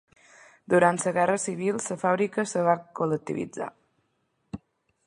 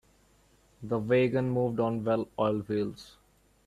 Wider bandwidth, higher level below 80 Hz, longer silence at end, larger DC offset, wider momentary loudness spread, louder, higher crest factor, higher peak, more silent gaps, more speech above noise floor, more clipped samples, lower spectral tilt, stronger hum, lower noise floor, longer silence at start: second, 11.5 kHz vs 13.5 kHz; about the same, -66 dBFS vs -62 dBFS; about the same, 0.5 s vs 0.55 s; neither; first, 18 LU vs 10 LU; first, -26 LUFS vs -29 LUFS; about the same, 22 dB vs 18 dB; first, -6 dBFS vs -12 dBFS; neither; first, 48 dB vs 35 dB; neither; second, -5.5 dB/octave vs -8 dB/octave; neither; first, -74 dBFS vs -64 dBFS; about the same, 0.7 s vs 0.8 s